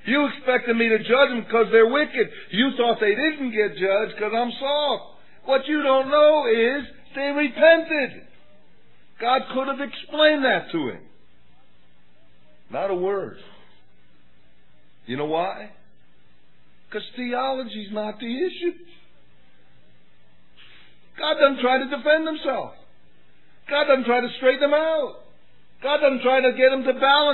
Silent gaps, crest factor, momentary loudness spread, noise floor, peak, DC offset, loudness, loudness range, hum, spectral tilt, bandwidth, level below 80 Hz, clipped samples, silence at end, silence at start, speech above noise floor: none; 20 dB; 13 LU; -61 dBFS; -4 dBFS; 0.8%; -21 LUFS; 12 LU; none; -7 dB/octave; 4.3 kHz; -68 dBFS; under 0.1%; 0 s; 0.05 s; 40 dB